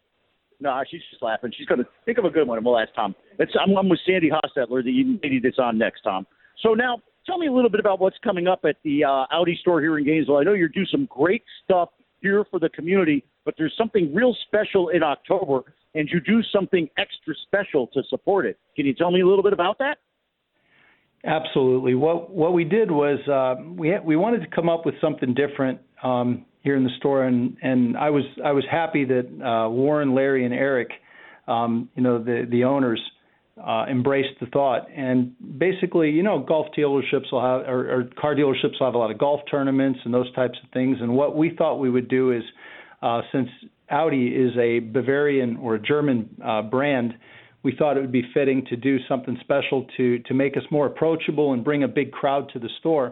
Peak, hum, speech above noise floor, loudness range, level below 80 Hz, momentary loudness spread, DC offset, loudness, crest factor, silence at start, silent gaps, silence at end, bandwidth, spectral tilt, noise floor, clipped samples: -6 dBFS; none; 53 dB; 2 LU; -66 dBFS; 7 LU; under 0.1%; -22 LUFS; 16 dB; 0.6 s; none; 0 s; 4.2 kHz; -10.5 dB/octave; -74 dBFS; under 0.1%